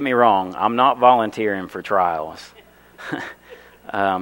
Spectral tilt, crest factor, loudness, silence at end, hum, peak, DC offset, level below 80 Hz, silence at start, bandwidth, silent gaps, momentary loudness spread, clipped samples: -5.5 dB/octave; 20 dB; -19 LUFS; 0 s; 60 Hz at -55 dBFS; 0 dBFS; under 0.1%; -60 dBFS; 0 s; 16.5 kHz; none; 18 LU; under 0.1%